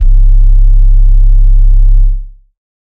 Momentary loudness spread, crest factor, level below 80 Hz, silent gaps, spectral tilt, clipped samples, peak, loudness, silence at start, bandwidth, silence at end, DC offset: 3 LU; 4 dB; -4 dBFS; none; -9 dB/octave; 0.2%; 0 dBFS; -11 LUFS; 0 s; 0.3 kHz; 0.7 s; under 0.1%